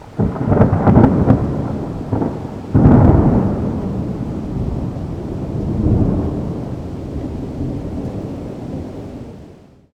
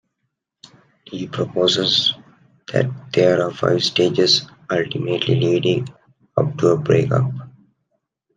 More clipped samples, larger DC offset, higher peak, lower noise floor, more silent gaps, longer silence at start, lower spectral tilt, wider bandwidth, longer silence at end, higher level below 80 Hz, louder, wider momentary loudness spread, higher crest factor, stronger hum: first, 0.2% vs under 0.1%; neither; about the same, 0 dBFS vs -2 dBFS; second, -42 dBFS vs -76 dBFS; neither; second, 0 s vs 1.1 s; first, -10.5 dB/octave vs -5.5 dB/octave; second, 8.2 kHz vs 9.4 kHz; second, 0.4 s vs 0.9 s; first, -28 dBFS vs -60 dBFS; about the same, -17 LUFS vs -18 LUFS; first, 16 LU vs 10 LU; about the same, 16 dB vs 18 dB; neither